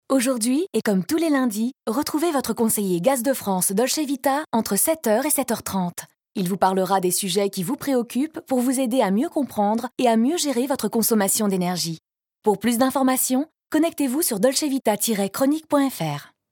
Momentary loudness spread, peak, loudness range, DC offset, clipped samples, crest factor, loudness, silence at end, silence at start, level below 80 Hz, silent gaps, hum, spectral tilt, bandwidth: 7 LU; -6 dBFS; 1 LU; under 0.1%; under 0.1%; 16 dB; -22 LUFS; 0.25 s; 0.1 s; -68 dBFS; none; none; -4 dB/octave; 18.5 kHz